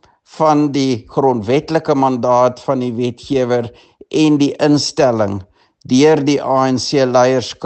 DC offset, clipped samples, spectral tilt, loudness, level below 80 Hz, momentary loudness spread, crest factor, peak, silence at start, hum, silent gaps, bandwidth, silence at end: under 0.1%; under 0.1%; -5.5 dB/octave; -15 LUFS; -54 dBFS; 7 LU; 14 dB; 0 dBFS; 0.35 s; none; none; 8.8 kHz; 0 s